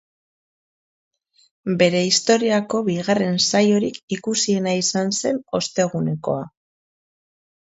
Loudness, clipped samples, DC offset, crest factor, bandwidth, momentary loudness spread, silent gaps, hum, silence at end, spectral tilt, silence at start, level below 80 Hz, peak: -20 LUFS; under 0.1%; under 0.1%; 20 dB; 8 kHz; 10 LU; 4.03-4.08 s; none; 1.15 s; -4 dB/octave; 1.65 s; -62 dBFS; -2 dBFS